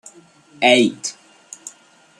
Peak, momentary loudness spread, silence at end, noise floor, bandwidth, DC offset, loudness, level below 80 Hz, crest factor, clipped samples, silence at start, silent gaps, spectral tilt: -2 dBFS; 24 LU; 0.5 s; -51 dBFS; 12.5 kHz; under 0.1%; -17 LUFS; -70 dBFS; 20 dB; under 0.1%; 0.6 s; none; -2.5 dB/octave